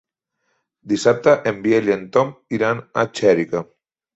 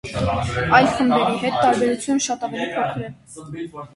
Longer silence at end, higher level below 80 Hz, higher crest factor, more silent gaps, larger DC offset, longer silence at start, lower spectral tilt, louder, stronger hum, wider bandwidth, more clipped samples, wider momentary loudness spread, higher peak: first, 0.55 s vs 0.1 s; second, -60 dBFS vs -42 dBFS; about the same, 18 dB vs 20 dB; neither; neither; first, 0.85 s vs 0.05 s; about the same, -5.5 dB/octave vs -4.5 dB/octave; about the same, -19 LUFS vs -19 LUFS; neither; second, 8.2 kHz vs 11.5 kHz; neither; second, 8 LU vs 17 LU; about the same, -2 dBFS vs 0 dBFS